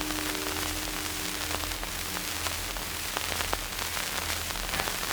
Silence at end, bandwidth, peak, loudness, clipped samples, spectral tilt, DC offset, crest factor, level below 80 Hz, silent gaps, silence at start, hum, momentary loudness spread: 0 s; over 20 kHz; -6 dBFS; -30 LUFS; under 0.1%; -1.5 dB/octave; under 0.1%; 26 dB; -44 dBFS; none; 0 s; none; 2 LU